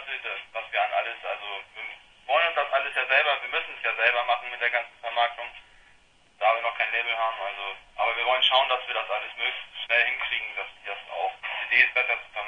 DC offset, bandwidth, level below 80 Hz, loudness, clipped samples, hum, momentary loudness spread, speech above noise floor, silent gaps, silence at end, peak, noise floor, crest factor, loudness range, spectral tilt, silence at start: under 0.1%; 10.5 kHz; -66 dBFS; -25 LUFS; under 0.1%; none; 14 LU; 31 dB; none; 0 s; -4 dBFS; -58 dBFS; 24 dB; 3 LU; -1 dB/octave; 0 s